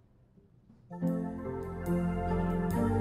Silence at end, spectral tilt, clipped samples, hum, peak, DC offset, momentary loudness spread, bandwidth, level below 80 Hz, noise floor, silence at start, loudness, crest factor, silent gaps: 0 s; -9 dB/octave; under 0.1%; none; -18 dBFS; under 0.1%; 8 LU; 15.5 kHz; -46 dBFS; -62 dBFS; 0.7 s; -33 LUFS; 14 dB; none